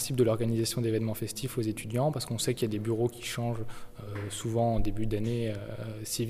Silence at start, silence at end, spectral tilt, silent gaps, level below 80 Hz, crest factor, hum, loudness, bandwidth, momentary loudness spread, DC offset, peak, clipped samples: 0 s; 0 s; -5.5 dB/octave; none; -44 dBFS; 16 dB; none; -31 LUFS; 15.5 kHz; 10 LU; under 0.1%; -14 dBFS; under 0.1%